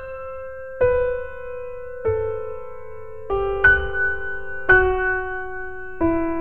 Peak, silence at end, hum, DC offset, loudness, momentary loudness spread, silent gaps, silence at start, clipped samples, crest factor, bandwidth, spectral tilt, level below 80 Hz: -2 dBFS; 0 s; none; 2%; -21 LUFS; 18 LU; none; 0 s; under 0.1%; 20 dB; 4.5 kHz; -8.5 dB/octave; -36 dBFS